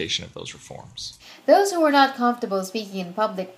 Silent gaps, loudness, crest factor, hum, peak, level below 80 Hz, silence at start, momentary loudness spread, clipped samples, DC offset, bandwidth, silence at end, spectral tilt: none; -21 LUFS; 20 dB; none; -4 dBFS; -62 dBFS; 0 s; 19 LU; under 0.1%; under 0.1%; 15.5 kHz; 0.05 s; -3.5 dB/octave